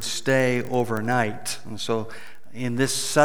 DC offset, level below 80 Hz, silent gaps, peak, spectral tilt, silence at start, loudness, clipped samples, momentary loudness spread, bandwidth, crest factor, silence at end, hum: 2%; -64 dBFS; none; -4 dBFS; -4 dB/octave; 0 s; -25 LUFS; under 0.1%; 12 LU; over 20 kHz; 20 dB; 0 s; none